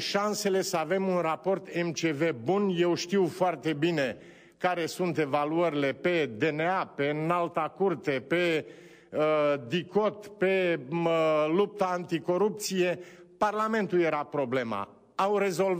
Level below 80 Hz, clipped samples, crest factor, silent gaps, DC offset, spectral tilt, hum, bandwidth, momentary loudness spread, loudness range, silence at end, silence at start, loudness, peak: -74 dBFS; under 0.1%; 14 dB; none; under 0.1%; -5 dB/octave; none; 15.5 kHz; 5 LU; 1 LU; 0 s; 0 s; -28 LUFS; -14 dBFS